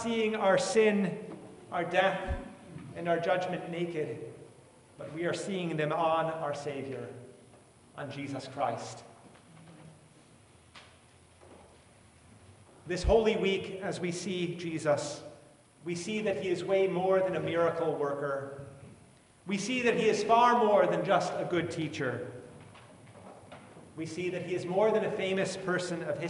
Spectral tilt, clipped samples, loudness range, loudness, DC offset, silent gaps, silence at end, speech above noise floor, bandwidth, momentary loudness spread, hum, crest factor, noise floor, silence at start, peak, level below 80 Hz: -5 dB/octave; under 0.1%; 12 LU; -31 LUFS; under 0.1%; none; 0 s; 29 dB; 11.5 kHz; 21 LU; none; 20 dB; -59 dBFS; 0 s; -12 dBFS; -52 dBFS